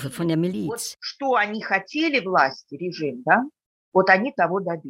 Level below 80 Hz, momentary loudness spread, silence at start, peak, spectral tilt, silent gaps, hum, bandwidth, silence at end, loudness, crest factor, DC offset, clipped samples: -68 dBFS; 11 LU; 0 s; -2 dBFS; -5 dB/octave; 3.66-3.92 s; none; 16 kHz; 0 s; -22 LUFS; 20 dB; under 0.1%; under 0.1%